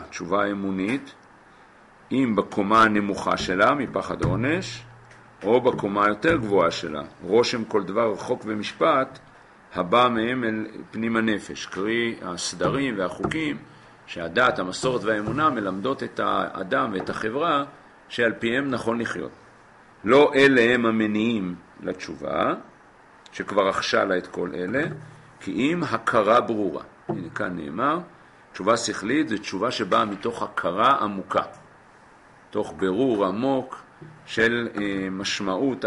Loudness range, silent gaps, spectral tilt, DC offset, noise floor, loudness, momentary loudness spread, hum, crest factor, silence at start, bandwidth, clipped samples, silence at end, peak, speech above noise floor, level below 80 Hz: 5 LU; none; -5 dB/octave; under 0.1%; -52 dBFS; -24 LUFS; 13 LU; none; 18 dB; 0 s; 11.5 kHz; under 0.1%; 0 s; -6 dBFS; 28 dB; -54 dBFS